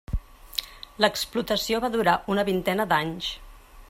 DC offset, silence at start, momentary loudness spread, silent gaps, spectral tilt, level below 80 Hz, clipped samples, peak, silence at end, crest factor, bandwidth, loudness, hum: under 0.1%; 0.1 s; 12 LU; none; -4 dB/octave; -42 dBFS; under 0.1%; -6 dBFS; 0.05 s; 20 dB; 16 kHz; -26 LUFS; none